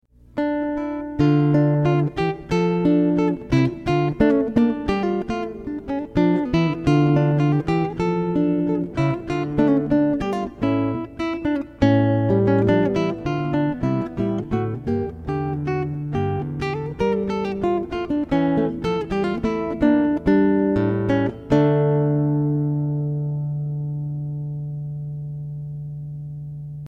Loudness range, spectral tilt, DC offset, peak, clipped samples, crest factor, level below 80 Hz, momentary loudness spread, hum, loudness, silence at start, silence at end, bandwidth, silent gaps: 5 LU; -9 dB/octave; under 0.1%; -4 dBFS; under 0.1%; 18 dB; -42 dBFS; 10 LU; 60 Hz at -50 dBFS; -21 LUFS; 0.35 s; 0 s; 7.8 kHz; none